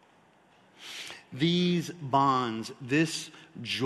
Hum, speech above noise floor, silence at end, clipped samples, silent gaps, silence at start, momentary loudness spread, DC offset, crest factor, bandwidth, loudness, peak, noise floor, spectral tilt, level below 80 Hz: none; 33 dB; 0 s; under 0.1%; none; 0.8 s; 16 LU; under 0.1%; 20 dB; 12.5 kHz; -28 LUFS; -10 dBFS; -61 dBFS; -5 dB/octave; -70 dBFS